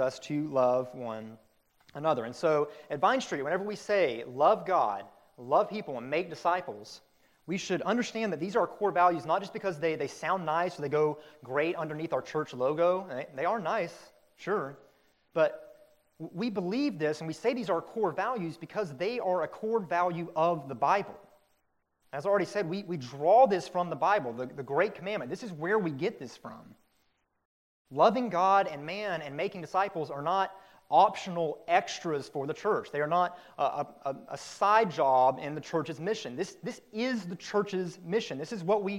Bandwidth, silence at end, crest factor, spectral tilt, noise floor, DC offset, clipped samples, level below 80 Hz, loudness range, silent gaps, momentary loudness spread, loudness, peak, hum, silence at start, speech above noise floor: 16 kHz; 0 s; 20 dB; -5.5 dB/octave; -75 dBFS; under 0.1%; under 0.1%; -76 dBFS; 4 LU; 27.45-27.85 s; 12 LU; -30 LUFS; -10 dBFS; none; 0 s; 45 dB